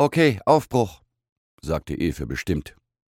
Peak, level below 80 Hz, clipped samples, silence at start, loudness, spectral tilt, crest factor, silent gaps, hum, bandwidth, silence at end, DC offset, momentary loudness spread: -2 dBFS; -42 dBFS; under 0.1%; 0 s; -23 LUFS; -6.5 dB/octave; 20 dB; 1.32-1.58 s; none; 17 kHz; 0.4 s; under 0.1%; 11 LU